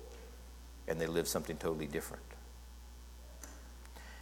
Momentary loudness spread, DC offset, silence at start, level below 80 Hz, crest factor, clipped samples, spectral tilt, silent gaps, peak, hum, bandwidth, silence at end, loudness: 19 LU; under 0.1%; 0 s; -52 dBFS; 22 dB; under 0.1%; -4 dB/octave; none; -20 dBFS; 60 Hz at -50 dBFS; 19 kHz; 0 s; -39 LUFS